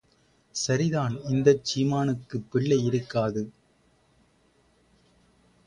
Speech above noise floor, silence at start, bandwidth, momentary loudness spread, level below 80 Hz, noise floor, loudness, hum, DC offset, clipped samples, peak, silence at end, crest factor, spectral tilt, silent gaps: 39 dB; 0.55 s; 10.5 kHz; 10 LU; -60 dBFS; -64 dBFS; -26 LUFS; none; under 0.1%; under 0.1%; -6 dBFS; 2.15 s; 22 dB; -6 dB/octave; none